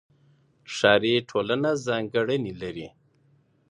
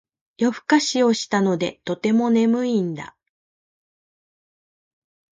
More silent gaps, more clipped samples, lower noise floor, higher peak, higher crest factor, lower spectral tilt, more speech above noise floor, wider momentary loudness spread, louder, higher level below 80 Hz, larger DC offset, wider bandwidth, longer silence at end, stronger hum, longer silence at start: neither; neither; second, -63 dBFS vs under -90 dBFS; about the same, -4 dBFS vs -4 dBFS; first, 24 dB vs 18 dB; about the same, -5 dB/octave vs -5 dB/octave; second, 39 dB vs over 70 dB; first, 16 LU vs 8 LU; second, -25 LUFS vs -20 LUFS; first, -62 dBFS vs -68 dBFS; neither; first, 11 kHz vs 9.2 kHz; second, 0.8 s vs 2.3 s; neither; first, 0.7 s vs 0.4 s